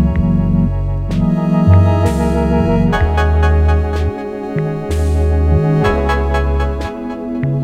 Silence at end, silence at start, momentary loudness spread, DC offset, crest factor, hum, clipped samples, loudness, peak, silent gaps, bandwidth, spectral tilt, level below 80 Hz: 0 s; 0 s; 8 LU; under 0.1%; 14 dB; none; under 0.1%; -15 LUFS; 0 dBFS; none; 10 kHz; -8.5 dB/octave; -18 dBFS